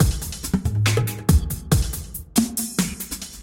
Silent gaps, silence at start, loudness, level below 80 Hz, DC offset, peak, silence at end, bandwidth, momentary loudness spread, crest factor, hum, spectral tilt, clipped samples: none; 0 s; -23 LUFS; -30 dBFS; under 0.1%; -2 dBFS; 0 s; 17 kHz; 8 LU; 18 dB; none; -5 dB/octave; under 0.1%